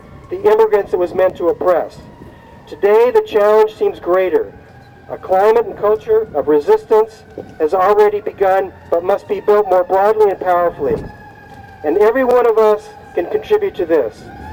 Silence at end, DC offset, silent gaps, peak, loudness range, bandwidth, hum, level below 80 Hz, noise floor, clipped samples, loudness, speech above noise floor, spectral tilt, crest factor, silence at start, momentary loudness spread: 0 s; under 0.1%; none; 0 dBFS; 2 LU; 16 kHz; none; -46 dBFS; -38 dBFS; under 0.1%; -14 LUFS; 24 dB; -6.5 dB/octave; 14 dB; 0.1 s; 11 LU